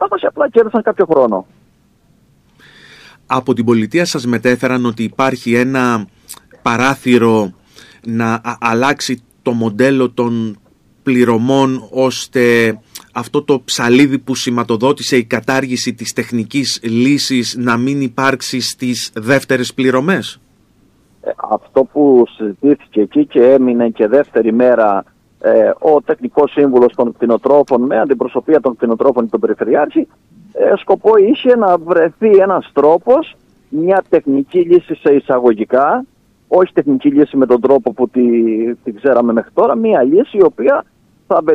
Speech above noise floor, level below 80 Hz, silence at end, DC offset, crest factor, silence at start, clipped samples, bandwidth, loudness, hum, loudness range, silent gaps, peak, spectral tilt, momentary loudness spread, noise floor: 40 dB; -56 dBFS; 0 s; under 0.1%; 12 dB; 0 s; under 0.1%; 15 kHz; -13 LUFS; none; 4 LU; none; 0 dBFS; -5.5 dB/octave; 8 LU; -52 dBFS